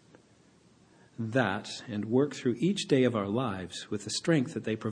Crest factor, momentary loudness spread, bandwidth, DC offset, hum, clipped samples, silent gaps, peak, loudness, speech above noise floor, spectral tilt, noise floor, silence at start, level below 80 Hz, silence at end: 20 dB; 11 LU; 10 kHz; under 0.1%; none; under 0.1%; none; -12 dBFS; -30 LUFS; 32 dB; -5.5 dB/octave; -62 dBFS; 1.2 s; -72 dBFS; 0 s